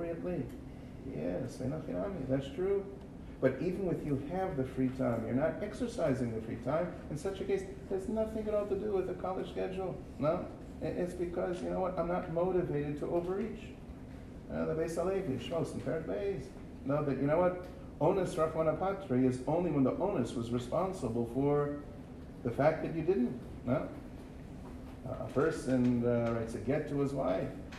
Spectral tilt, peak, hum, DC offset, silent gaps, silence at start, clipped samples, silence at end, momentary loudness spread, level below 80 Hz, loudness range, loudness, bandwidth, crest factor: -7.5 dB/octave; -16 dBFS; none; under 0.1%; none; 0 s; under 0.1%; 0 s; 14 LU; -52 dBFS; 4 LU; -35 LUFS; 13 kHz; 20 dB